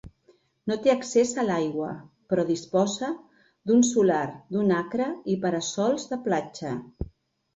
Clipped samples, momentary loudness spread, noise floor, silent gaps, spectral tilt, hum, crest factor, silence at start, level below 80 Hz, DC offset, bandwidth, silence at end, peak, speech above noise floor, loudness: under 0.1%; 14 LU; -63 dBFS; none; -5 dB/octave; none; 18 dB; 0.05 s; -54 dBFS; under 0.1%; 8.2 kHz; 0.5 s; -8 dBFS; 38 dB; -26 LUFS